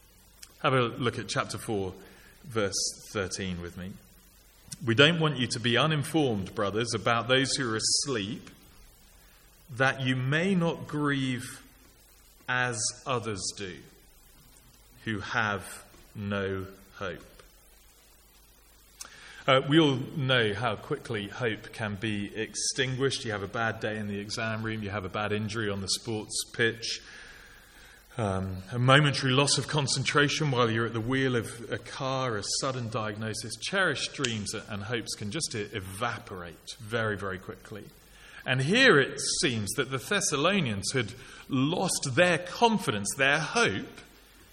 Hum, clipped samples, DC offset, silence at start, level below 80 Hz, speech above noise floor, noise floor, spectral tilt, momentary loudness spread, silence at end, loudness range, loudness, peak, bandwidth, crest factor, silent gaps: none; under 0.1%; under 0.1%; 0.4 s; -58 dBFS; 29 dB; -58 dBFS; -4 dB/octave; 15 LU; 0.45 s; 9 LU; -28 LUFS; -4 dBFS; 17 kHz; 26 dB; none